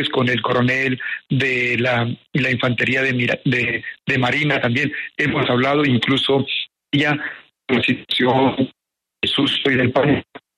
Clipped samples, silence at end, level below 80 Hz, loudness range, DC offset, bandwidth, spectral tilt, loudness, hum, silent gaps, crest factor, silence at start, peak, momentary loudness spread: under 0.1%; 0.2 s; -54 dBFS; 1 LU; under 0.1%; 11.5 kHz; -6 dB/octave; -18 LUFS; none; none; 14 dB; 0 s; -4 dBFS; 6 LU